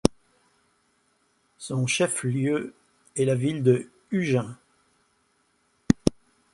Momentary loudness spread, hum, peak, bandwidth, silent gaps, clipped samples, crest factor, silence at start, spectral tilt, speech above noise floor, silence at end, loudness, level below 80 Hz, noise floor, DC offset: 11 LU; none; 0 dBFS; 11.5 kHz; none; under 0.1%; 28 dB; 0.05 s; -5.5 dB/octave; 44 dB; 0.4 s; -26 LUFS; -52 dBFS; -68 dBFS; under 0.1%